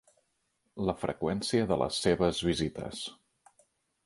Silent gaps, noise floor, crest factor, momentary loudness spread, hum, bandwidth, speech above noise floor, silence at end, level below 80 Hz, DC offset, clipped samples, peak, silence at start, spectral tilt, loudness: none; -77 dBFS; 20 dB; 12 LU; none; 11.5 kHz; 47 dB; 0.9 s; -54 dBFS; under 0.1%; under 0.1%; -12 dBFS; 0.75 s; -5 dB/octave; -31 LUFS